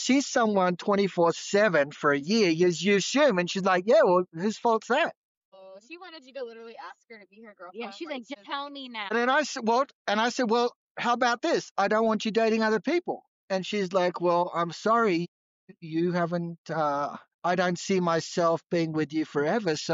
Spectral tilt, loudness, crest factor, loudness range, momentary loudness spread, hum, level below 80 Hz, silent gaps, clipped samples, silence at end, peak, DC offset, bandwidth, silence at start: -3.5 dB/octave; -26 LUFS; 14 dB; 9 LU; 16 LU; none; -78 dBFS; 5.16-5.52 s, 9.95-10.05 s, 10.75-10.95 s, 11.71-11.75 s, 13.28-13.48 s, 15.28-15.68 s, 16.58-16.65 s, 17.34-17.39 s; under 0.1%; 0 s; -12 dBFS; under 0.1%; 7.8 kHz; 0 s